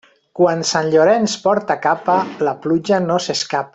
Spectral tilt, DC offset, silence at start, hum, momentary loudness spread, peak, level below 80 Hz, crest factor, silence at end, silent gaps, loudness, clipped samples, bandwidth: -4.5 dB/octave; under 0.1%; 0.35 s; none; 6 LU; -2 dBFS; -60 dBFS; 16 dB; 0.05 s; none; -17 LUFS; under 0.1%; 8.4 kHz